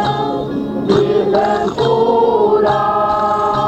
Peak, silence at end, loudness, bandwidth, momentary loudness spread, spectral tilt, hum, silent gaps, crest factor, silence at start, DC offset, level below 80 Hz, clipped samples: -2 dBFS; 0 s; -14 LUFS; 8.6 kHz; 6 LU; -7 dB/octave; none; none; 12 dB; 0 s; under 0.1%; -44 dBFS; under 0.1%